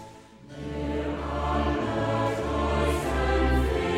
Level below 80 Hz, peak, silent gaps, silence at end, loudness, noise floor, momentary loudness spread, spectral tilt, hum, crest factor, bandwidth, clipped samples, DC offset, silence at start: -32 dBFS; -12 dBFS; none; 0 s; -27 LUFS; -47 dBFS; 11 LU; -6.5 dB/octave; none; 14 dB; 15 kHz; under 0.1%; under 0.1%; 0 s